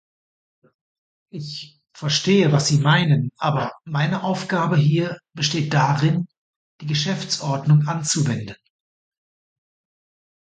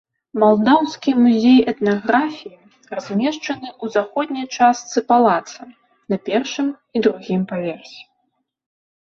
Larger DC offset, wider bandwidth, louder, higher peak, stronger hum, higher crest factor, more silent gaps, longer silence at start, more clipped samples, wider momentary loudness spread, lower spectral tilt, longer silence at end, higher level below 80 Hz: neither; first, 9.2 kHz vs 7.2 kHz; about the same, -20 LUFS vs -18 LUFS; about the same, -4 dBFS vs -2 dBFS; neither; about the same, 18 dB vs 18 dB; first, 6.38-6.79 s vs none; first, 1.35 s vs 0.35 s; neither; about the same, 16 LU vs 14 LU; about the same, -5 dB/octave vs -5.5 dB/octave; first, 1.95 s vs 1.15 s; about the same, -60 dBFS vs -62 dBFS